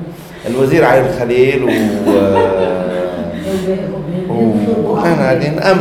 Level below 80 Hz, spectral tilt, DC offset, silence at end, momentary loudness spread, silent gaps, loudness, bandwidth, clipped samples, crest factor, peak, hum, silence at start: -40 dBFS; -7 dB/octave; under 0.1%; 0 s; 9 LU; none; -13 LUFS; 16.5 kHz; under 0.1%; 12 dB; 0 dBFS; none; 0 s